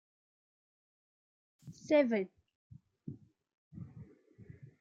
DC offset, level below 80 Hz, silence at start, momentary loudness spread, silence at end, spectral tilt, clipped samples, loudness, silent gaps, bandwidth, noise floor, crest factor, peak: under 0.1%; -78 dBFS; 1.65 s; 27 LU; 0.35 s; -6.5 dB/octave; under 0.1%; -32 LUFS; 2.55-2.70 s, 3.54-3.71 s; 7.6 kHz; -58 dBFS; 24 dB; -16 dBFS